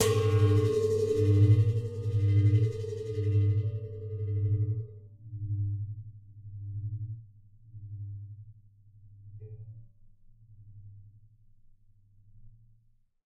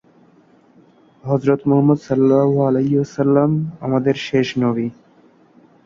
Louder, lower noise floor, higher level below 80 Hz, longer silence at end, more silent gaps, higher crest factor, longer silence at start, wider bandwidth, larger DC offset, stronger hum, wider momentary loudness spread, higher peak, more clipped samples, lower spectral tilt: second, -29 LUFS vs -17 LUFS; first, -65 dBFS vs -52 dBFS; about the same, -54 dBFS vs -56 dBFS; about the same, 0.85 s vs 0.95 s; neither; about the same, 18 dB vs 16 dB; second, 0 s vs 1.25 s; first, 12 kHz vs 7.2 kHz; neither; neither; first, 23 LU vs 7 LU; second, -12 dBFS vs -2 dBFS; neither; about the same, -7 dB/octave vs -8 dB/octave